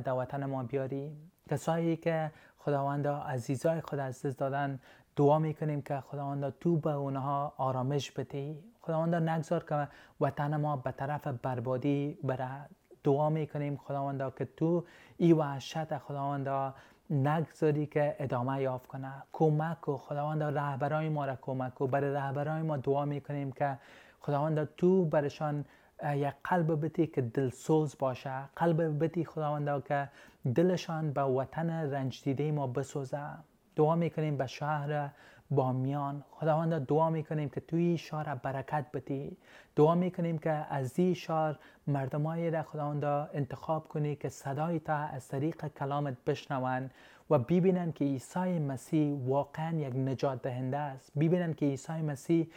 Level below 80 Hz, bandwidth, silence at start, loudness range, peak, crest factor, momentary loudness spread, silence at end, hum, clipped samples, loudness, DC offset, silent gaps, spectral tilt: -72 dBFS; 14.5 kHz; 0 s; 3 LU; -12 dBFS; 20 dB; 9 LU; 0.05 s; none; under 0.1%; -33 LUFS; under 0.1%; none; -8 dB/octave